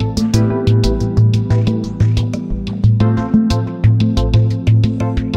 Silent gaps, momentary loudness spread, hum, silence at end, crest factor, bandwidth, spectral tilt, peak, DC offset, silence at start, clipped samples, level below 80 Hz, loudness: none; 5 LU; none; 0 s; 12 dB; 8.4 kHz; -8 dB/octave; -2 dBFS; under 0.1%; 0 s; under 0.1%; -24 dBFS; -15 LUFS